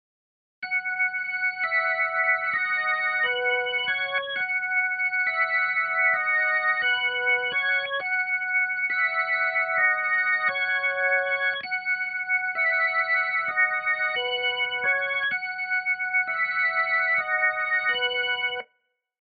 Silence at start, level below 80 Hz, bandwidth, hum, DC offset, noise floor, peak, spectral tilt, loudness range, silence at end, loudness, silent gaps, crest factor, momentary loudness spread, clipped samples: 0.6 s; -74 dBFS; 4.7 kHz; none; under 0.1%; -74 dBFS; -12 dBFS; 4 dB/octave; 1 LU; 0.6 s; -23 LUFS; none; 14 dB; 4 LU; under 0.1%